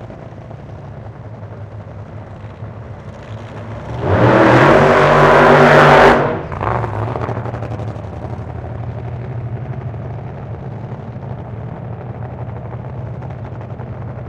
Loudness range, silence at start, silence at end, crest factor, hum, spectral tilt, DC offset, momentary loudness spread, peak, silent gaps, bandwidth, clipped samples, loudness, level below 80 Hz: 19 LU; 0 s; 0 s; 16 dB; none; -7 dB/octave; under 0.1%; 24 LU; 0 dBFS; none; 12.5 kHz; under 0.1%; -12 LUFS; -36 dBFS